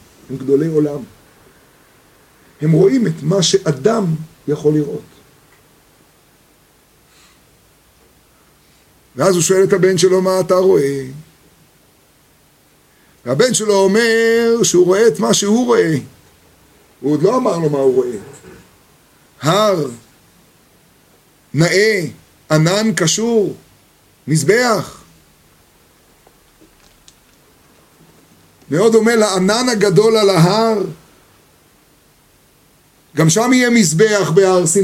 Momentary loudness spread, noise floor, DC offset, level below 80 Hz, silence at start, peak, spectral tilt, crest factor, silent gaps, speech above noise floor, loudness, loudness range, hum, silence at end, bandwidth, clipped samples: 13 LU; -52 dBFS; under 0.1%; -56 dBFS; 0.3 s; 0 dBFS; -4.5 dB/octave; 16 dB; none; 39 dB; -14 LUFS; 7 LU; none; 0 s; 16.5 kHz; under 0.1%